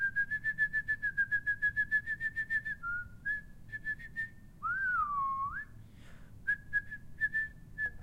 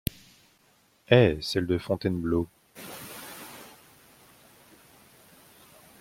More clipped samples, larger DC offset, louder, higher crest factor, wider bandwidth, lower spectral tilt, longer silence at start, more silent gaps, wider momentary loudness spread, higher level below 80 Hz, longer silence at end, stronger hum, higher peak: neither; neither; second, -34 LUFS vs -26 LUFS; second, 14 dB vs 26 dB; about the same, 15.5 kHz vs 16.5 kHz; second, -4.5 dB/octave vs -6 dB/octave; second, 0 s vs 1.1 s; neither; second, 9 LU vs 24 LU; about the same, -56 dBFS vs -52 dBFS; second, 0 s vs 2.35 s; neither; second, -22 dBFS vs -4 dBFS